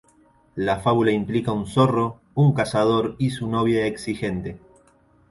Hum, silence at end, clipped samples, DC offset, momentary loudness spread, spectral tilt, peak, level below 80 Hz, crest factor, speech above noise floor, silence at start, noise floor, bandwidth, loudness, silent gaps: none; 0.75 s; under 0.1%; under 0.1%; 8 LU; -7 dB/octave; -4 dBFS; -50 dBFS; 18 dB; 36 dB; 0.55 s; -57 dBFS; 11.5 kHz; -22 LUFS; none